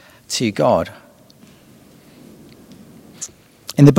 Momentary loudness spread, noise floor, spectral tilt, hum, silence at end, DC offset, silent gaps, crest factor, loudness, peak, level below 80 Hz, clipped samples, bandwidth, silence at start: 23 LU; -47 dBFS; -6 dB/octave; none; 0 s; under 0.1%; none; 20 dB; -19 LUFS; 0 dBFS; -52 dBFS; 0.2%; 15.5 kHz; 0.3 s